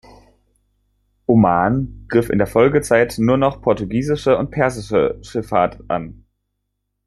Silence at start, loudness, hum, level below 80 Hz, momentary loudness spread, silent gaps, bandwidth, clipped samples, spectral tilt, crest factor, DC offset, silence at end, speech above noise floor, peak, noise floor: 1.3 s; -18 LUFS; 50 Hz at -40 dBFS; -42 dBFS; 10 LU; none; 13 kHz; under 0.1%; -7 dB/octave; 16 dB; under 0.1%; 0.95 s; 57 dB; -2 dBFS; -74 dBFS